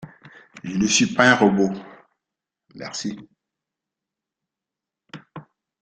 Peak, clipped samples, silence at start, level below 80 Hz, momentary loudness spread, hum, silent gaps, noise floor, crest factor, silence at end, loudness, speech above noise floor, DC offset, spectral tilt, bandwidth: -2 dBFS; under 0.1%; 0 s; -58 dBFS; 24 LU; none; none; -87 dBFS; 22 dB; 0.4 s; -19 LUFS; 67 dB; under 0.1%; -3.5 dB/octave; 9.2 kHz